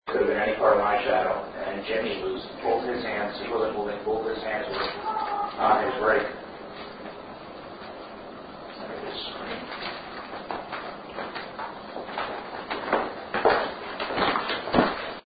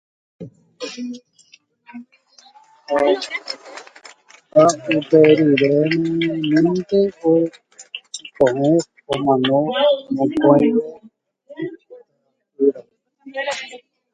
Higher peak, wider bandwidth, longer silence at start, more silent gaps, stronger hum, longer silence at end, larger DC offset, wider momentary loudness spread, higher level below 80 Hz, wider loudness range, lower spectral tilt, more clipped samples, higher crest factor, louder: second, -4 dBFS vs 0 dBFS; second, 5 kHz vs 9.4 kHz; second, 0.05 s vs 0.4 s; neither; neither; second, 0.05 s vs 0.35 s; neither; second, 17 LU vs 20 LU; first, -54 dBFS vs -60 dBFS; about the same, 10 LU vs 10 LU; first, -8.5 dB/octave vs -5.5 dB/octave; neither; first, 24 dB vs 18 dB; second, -28 LUFS vs -17 LUFS